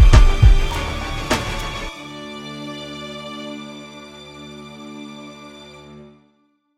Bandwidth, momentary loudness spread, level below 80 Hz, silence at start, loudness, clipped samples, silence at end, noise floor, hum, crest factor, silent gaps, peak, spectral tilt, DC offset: 13 kHz; 23 LU; -20 dBFS; 0 s; -22 LUFS; under 0.1%; 1.3 s; -63 dBFS; none; 18 dB; none; 0 dBFS; -5.5 dB/octave; under 0.1%